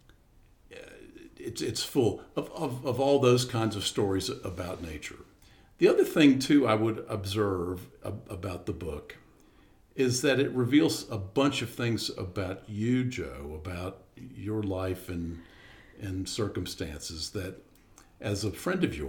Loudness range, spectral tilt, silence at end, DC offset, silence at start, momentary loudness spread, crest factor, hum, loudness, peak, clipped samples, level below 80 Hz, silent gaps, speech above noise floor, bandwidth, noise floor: 9 LU; -5.5 dB/octave; 0 s; under 0.1%; 0.7 s; 17 LU; 22 dB; none; -29 LUFS; -8 dBFS; under 0.1%; -54 dBFS; none; 31 dB; 18.5 kHz; -60 dBFS